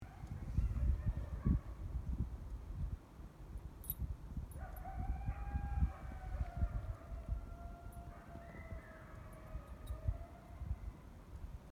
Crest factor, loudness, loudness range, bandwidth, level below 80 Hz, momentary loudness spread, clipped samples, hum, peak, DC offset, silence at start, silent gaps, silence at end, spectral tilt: 20 dB; -45 LUFS; 7 LU; 16 kHz; -44 dBFS; 15 LU; under 0.1%; none; -22 dBFS; under 0.1%; 0 s; none; 0 s; -8 dB/octave